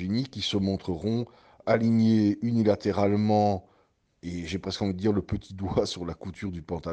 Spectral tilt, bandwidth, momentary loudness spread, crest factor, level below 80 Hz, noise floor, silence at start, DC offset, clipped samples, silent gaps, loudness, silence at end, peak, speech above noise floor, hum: -7 dB/octave; 8.8 kHz; 13 LU; 18 dB; -52 dBFS; -67 dBFS; 0 s; under 0.1%; under 0.1%; none; -27 LUFS; 0 s; -8 dBFS; 40 dB; none